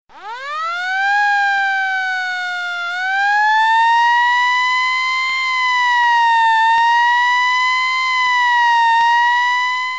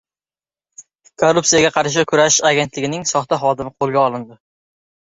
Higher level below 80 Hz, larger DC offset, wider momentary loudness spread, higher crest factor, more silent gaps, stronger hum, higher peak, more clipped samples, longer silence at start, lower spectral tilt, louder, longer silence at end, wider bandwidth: second, -68 dBFS vs -54 dBFS; first, 0.4% vs under 0.1%; about the same, 8 LU vs 8 LU; second, 10 dB vs 18 dB; neither; neither; second, -6 dBFS vs 0 dBFS; neither; second, 0.15 s vs 0.8 s; second, 2.5 dB/octave vs -3 dB/octave; about the same, -14 LUFS vs -16 LUFS; second, 0 s vs 0.7 s; first, 9.6 kHz vs 8 kHz